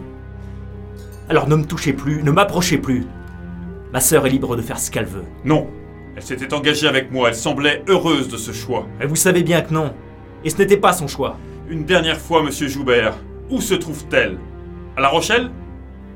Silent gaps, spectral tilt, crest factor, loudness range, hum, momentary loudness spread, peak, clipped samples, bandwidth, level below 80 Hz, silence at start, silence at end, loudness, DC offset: none; -4 dB/octave; 18 dB; 2 LU; none; 20 LU; 0 dBFS; under 0.1%; 17 kHz; -38 dBFS; 0 s; 0 s; -18 LUFS; under 0.1%